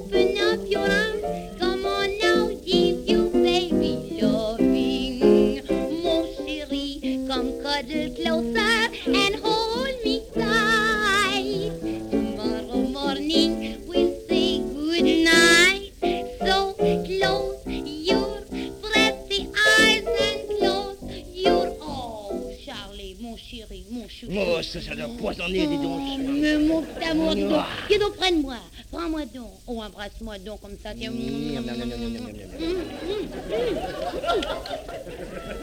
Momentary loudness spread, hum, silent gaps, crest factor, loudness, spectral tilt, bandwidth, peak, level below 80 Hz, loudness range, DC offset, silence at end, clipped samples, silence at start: 16 LU; none; none; 20 dB; -23 LUFS; -4 dB/octave; 17 kHz; -4 dBFS; -42 dBFS; 11 LU; under 0.1%; 0 s; under 0.1%; 0 s